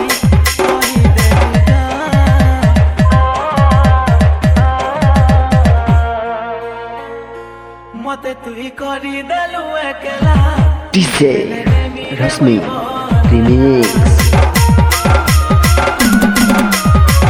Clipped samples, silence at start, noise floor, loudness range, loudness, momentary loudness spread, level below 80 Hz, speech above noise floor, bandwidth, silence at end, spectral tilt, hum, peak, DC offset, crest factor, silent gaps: under 0.1%; 0 s; -32 dBFS; 10 LU; -11 LUFS; 13 LU; -18 dBFS; 21 dB; 17.5 kHz; 0 s; -6 dB/octave; none; 0 dBFS; under 0.1%; 10 dB; none